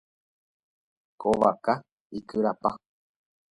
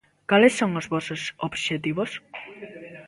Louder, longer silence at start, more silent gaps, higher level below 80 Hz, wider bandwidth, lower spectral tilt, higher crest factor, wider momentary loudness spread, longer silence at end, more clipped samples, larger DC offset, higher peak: second, -27 LUFS vs -24 LUFS; first, 1.2 s vs 0.3 s; first, 1.92-2.10 s vs none; about the same, -62 dBFS vs -64 dBFS; about the same, 11.5 kHz vs 11.5 kHz; first, -7 dB/octave vs -5 dB/octave; about the same, 24 dB vs 22 dB; second, 17 LU vs 22 LU; first, 0.8 s vs 0 s; neither; neither; about the same, -6 dBFS vs -4 dBFS